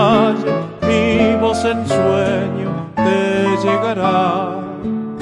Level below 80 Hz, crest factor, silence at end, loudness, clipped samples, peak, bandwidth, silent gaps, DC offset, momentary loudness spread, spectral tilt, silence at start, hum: -46 dBFS; 14 dB; 0 s; -16 LUFS; under 0.1%; 0 dBFS; 11.5 kHz; none; under 0.1%; 8 LU; -6.5 dB/octave; 0 s; none